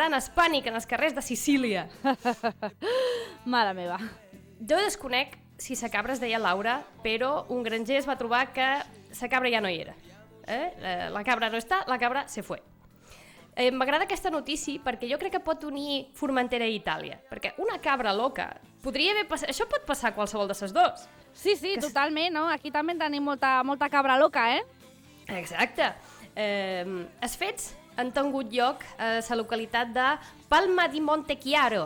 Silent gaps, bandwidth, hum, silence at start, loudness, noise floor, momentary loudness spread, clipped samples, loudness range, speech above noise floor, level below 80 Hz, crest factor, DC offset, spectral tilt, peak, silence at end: none; over 20 kHz; none; 0 s; -28 LUFS; -54 dBFS; 10 LU; under 0.1%; 4 LU; 25 dB; -58 dBFS; 20 dB; under 0.1%; -3 dB/octave; -10 dBFS; 0 s